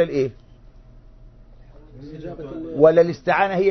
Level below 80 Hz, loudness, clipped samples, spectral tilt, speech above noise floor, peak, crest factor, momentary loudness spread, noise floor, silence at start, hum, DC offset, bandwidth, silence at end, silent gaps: -48 dBFS; -18 LUFS; under 0.1%; -7.5 dB/octave; 27 dB; -2 dBFS; 20 dB; 21 LU; -46 dBFS; 0 s; none; under 0.1%; 6.4 kHz; 0 s; none